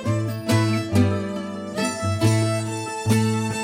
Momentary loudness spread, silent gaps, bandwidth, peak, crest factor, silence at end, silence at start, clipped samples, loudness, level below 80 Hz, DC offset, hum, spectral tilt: 7 LU; none; 16 kHz; -6 dBFS; 16 dB; 0 s; 0 s; under 0.1%; -23 LUFS; -56 dBFS; under 0.1%; none; -6 dB/octave